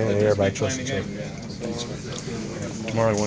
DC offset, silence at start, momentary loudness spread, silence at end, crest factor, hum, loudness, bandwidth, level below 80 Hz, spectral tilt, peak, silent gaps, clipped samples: under 0.1%; 0 s; 11 LU; 0 s; 18 dB; none; -26 LUFS; 8 kHz; -46 dBFS; -5 dB/octave; -6 dBFS; none; under 0.1%